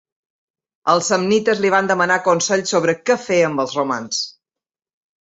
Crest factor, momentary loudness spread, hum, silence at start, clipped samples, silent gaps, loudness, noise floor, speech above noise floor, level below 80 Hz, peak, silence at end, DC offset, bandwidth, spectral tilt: 18 dB; 6 LU; none; 0.85 s; under 0.1%; none; -17 LUFS; -89 dBFS; 72 dB; -64 dBFS; -2 dBFS; 0.9 s; under 0.1%; 8.2 kHz; -3.5 dB/octave